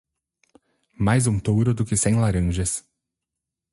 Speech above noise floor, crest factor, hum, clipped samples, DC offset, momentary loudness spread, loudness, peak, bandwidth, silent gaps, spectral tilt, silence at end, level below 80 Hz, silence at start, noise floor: 65 dB; 16 dB; none; under 0.1%; under 0.1%; 6 LU; -22 LUFS; -6 dBFS; 11.5 kHz; none; -5.5 dB/octave; 0.9 s; -38 dBFS; 1 s; -85 dBFS